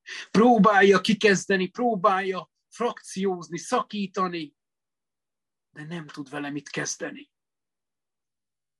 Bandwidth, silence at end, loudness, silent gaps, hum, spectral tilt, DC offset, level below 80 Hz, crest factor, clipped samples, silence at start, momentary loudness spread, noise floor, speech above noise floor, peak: 12 kHz; 1.55 s; -23 LUFS; none; none; -5 dB/octave; under 0.1%; -72 dBFS; 18 dB; under 0.1%; 0.05 s; 19 LU; under -90 dBFS; over 66 dB; -6 dBFS